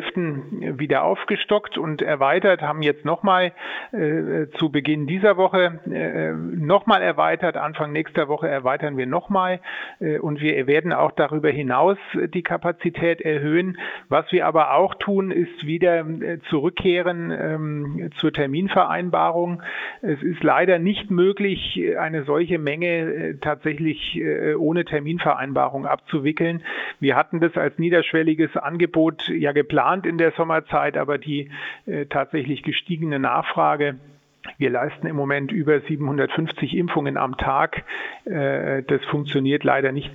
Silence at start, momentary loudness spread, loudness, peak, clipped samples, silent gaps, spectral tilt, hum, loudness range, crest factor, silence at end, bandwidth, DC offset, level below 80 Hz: 0 s; 8 LU; -22 LUFS; -2 dBFS; under 0.1%; none; -8.5 dB/octave; none; 3 LU; 20 dB; 0 s; 4.7 kHz; under 0.1%; -54 dBFS